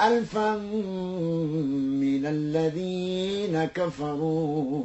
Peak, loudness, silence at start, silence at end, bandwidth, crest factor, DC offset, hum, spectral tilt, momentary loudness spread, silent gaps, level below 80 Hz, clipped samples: -10 dBFS; -27 LUFS; 0 s; 0 s; 8.4 kHz; 16 dB; under 0.1%; none; -7 dB/octave; 4 LU; none; -58 dBFS; under 0.1%